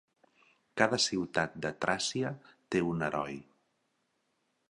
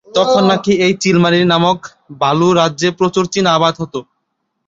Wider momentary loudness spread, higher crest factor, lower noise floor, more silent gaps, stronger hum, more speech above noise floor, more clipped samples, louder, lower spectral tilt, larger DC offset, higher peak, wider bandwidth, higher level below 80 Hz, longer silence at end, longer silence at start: first, 13 LU vs 8 LU; first, 26 dB vs 14 dB; first, -78 dBFS vs -70 dBFS; neither; neither; second, 46 dB vs 57 dB; neither; second, -32 LUFS vs -13 LUFS; second, -3.5 dB/octave vs -5 dB/octave; neither; second, -8 dBFS vs 0 dBFS; first, 11.5 kHz vs 8 kHz; second, -66 dBFS vs -52 dBFS; first, 1.25 s vs 0.65 s; first, 0.75 s vs 0.15 s